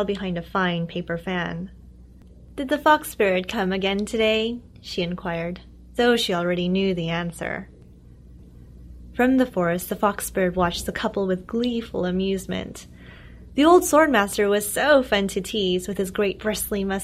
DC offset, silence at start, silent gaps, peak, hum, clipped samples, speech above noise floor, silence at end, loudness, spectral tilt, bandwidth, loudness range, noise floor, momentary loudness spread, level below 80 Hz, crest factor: under 0.1%; 0 s; none; -4 dBFS; none; under 0.1%; 24 dB; 0 s; -23 LUFS; -4.5 dB/octave; 16 kHz; 6 LU; -47 dBFS; 12 LU; -46 dBFS; 20 dB